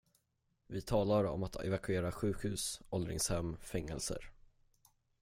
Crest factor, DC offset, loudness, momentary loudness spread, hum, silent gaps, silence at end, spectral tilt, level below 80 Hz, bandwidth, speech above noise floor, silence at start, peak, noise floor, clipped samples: 18 dB; under 0.1%; -38 LUFS; 9 LU; none; none; 0.9 s; -5 dB/octave; -54 dBFS; 16.5 kHz; 43 dB; 0.7 s; -20 dBFS; -80 dBFS; under 0.1%